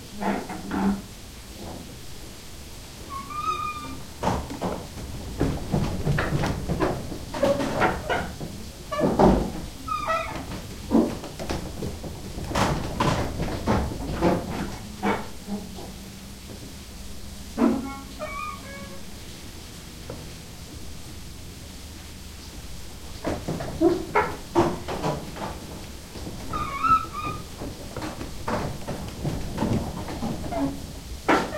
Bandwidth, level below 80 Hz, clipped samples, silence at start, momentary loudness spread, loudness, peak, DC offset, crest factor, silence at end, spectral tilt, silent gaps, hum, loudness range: 16.5 kHz; -40 dBFS; under 0.1%; 0 s; 17 LU; -28 LUFS; -4 dBFS; under 0.1%; 24 dB; 0 s; -5.5 dB/octave; none; none; 11 LU